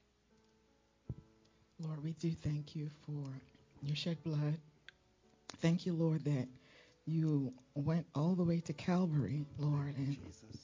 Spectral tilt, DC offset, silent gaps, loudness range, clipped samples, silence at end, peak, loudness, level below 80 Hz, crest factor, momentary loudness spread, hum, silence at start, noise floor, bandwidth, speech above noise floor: -7.5 dB/octave; under 0.1%; none; 8 LU; under 0.1%; 0.05 s; -22 dBFS; -39 LUFS; -66 dBFS; 18 dB; 16 LU; none; 1.1 s; -73 dBFS; 7.6 kHz; 36 dB